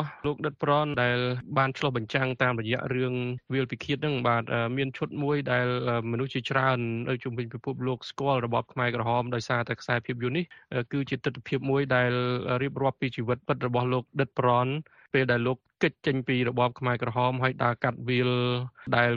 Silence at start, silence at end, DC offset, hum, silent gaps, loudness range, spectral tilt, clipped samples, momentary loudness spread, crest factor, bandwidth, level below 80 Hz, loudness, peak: 0 s; 0 s; under 0.1%; none; none; 2 LU; -7 dB/octave; under 0.1%; 6 LU; 20 dB; 7.4 kHz; -62 dBFS; -28 LUFS; -8 dBFS